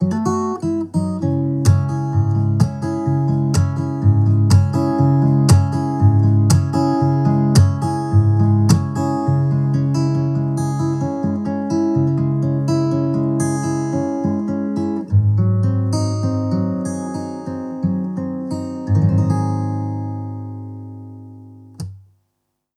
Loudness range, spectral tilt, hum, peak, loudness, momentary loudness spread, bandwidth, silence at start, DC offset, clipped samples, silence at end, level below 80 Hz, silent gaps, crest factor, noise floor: 7 LU; -7.5 dB/octave; none; -2 dBFS; -18 LUFS; 11 LU; 13 kHz; 0 s; under 0.1%; under 0.1%; 0.75 s; -44 dBFS; none; 16 dB; -73 dBFS